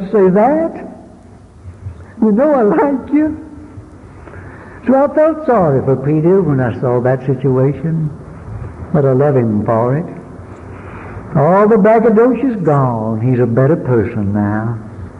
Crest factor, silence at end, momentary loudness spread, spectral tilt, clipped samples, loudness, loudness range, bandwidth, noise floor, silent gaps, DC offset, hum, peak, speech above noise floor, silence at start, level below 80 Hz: 10 dB; 0 s; 21 LU; -11 dB/octave; under 0.1%; -13 LUFS; 4 LU; 6.2 kHz; -39 dBFS; none; under 0.1%; none; -2 dBFS; 27 dB; 0 s; -40 dBFS